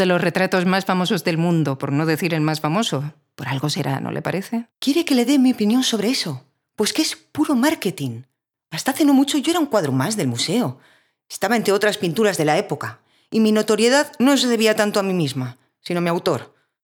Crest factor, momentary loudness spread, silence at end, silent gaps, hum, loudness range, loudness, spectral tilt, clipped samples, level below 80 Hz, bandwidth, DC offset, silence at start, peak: 18 dB; 11 LU; 0.35 s; none; none; 3 LU; -20 LUFS; -5 dB/octave; under 0.1%; -70 dBFS; 19 kHz; under 0.1%; 0 s; -2 dBFS